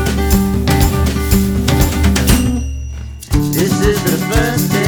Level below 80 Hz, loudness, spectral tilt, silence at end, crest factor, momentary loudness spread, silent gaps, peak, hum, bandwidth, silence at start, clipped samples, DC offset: -18 dBFS; -14 LUFS; -5 dB/octave; 0 s; 14 dB; 7 LU; none; 0 dBFS; none; over 20 kHz; 0 s; under 0.1%; under 0.1%